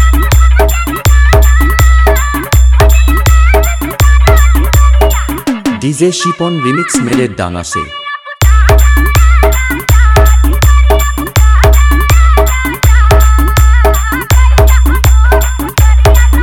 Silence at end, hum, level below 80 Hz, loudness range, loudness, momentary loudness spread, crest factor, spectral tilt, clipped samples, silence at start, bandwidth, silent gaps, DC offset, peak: 0 s; none; -8 dBFS; 3 LU; -9 LUFS; 6 LU; 6 dB; -5 dB/octave; 2%; 0 s; 18 kHz; none; under 0.1%; 0 dBFS